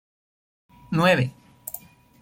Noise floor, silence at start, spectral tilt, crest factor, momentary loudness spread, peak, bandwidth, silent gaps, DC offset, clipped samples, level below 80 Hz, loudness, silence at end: -43 dBFS; 0.9 s; -5.5 dB/octave; 20 dB; 19 LU; -6 dBFS; 16.5 kHz; none; under 0.1%; under 0.1%; -60 dBFS; -22 LUFS; 0.45 s